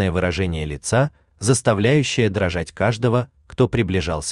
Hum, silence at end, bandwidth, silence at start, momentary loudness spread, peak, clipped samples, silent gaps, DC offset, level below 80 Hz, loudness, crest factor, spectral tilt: none; 0 s; 12.5 kHz; 0 s; 7 LU; -4 dBFS; under 0.1%; none; under 0.1%; -42 dBFS; -20 LUFS; 16 dB; -5.5 dB/octave